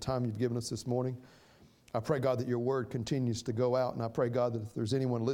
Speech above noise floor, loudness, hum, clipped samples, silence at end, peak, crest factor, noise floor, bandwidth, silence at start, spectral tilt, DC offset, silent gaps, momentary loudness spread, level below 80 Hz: 28 dB; -33 LUFS; none; under 0.1%; 0 s; -16 dBFS; 18 dB; -61 dBFS; 16 kHz; 0 s; -6.5 dB/octave; under 0.1%; none; 6 LU; -62 dBFS